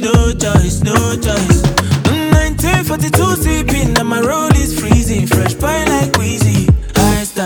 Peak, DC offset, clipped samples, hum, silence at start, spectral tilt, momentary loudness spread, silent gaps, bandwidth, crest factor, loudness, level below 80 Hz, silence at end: 0 dBFS; under 0.1%; under 0.1%; none; 0 s; -5 dB/octave; 2 LU; none; 19 kHz; 12 dB; -13 LUFS; -20 dBFS; 0 s